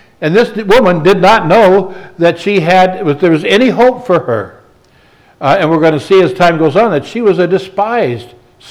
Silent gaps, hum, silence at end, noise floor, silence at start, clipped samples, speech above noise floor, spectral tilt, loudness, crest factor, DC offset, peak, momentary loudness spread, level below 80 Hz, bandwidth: none; none; 0.45 s; -46 dBFS; 0.2 s; under 0.1%; 37 dB; -6.5 dB/octave; -10 LUFS; 10 dB; under 0.1%; 0 dBFS; 7 LU; -44 dBFS; 19 kHz